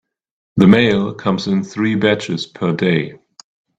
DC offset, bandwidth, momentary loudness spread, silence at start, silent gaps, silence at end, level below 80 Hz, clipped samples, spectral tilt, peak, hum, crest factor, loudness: under 0.1%; 8 kHz; 10 LU; 0.55 s; none; 0.65 s; -52 dBFS; under 0.1%; -6.5 dB/octave; 0 dBFS; none; 16 dB; -16 LUFS